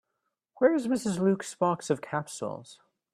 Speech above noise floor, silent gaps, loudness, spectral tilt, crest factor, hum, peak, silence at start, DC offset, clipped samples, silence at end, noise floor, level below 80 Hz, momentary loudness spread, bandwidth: 54 dB; none; -29 LUFS; -6 dB/octave; 20 dB; none; -10 dBFS; 0.6 s; under 0.1%; under 0.1%; 0.4 s; -82 dBFS; -70 dBFS; 11 LU; 14 kHz